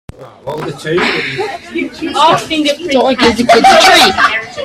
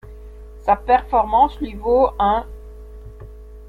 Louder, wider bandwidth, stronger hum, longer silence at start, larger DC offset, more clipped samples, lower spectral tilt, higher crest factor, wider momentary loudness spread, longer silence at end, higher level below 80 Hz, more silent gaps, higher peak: first, -9 LUFS vs -18 LUFS; first, 17 kHz vs 4.8 kHz; neither; first, 0.2 s vs 0.05 s; neither; first, 0.2% vs under 0.1%; second, -3 dB/octave vs -7.5 dB/octave; second, 10 dB vs 18 dB; second, 16 LU vs 23 LU; about the same, 0 s vs 0 s; second, -42 dBFS vs -36 dBFS; neither; about the same, 0 dBFS vs -2 dBFS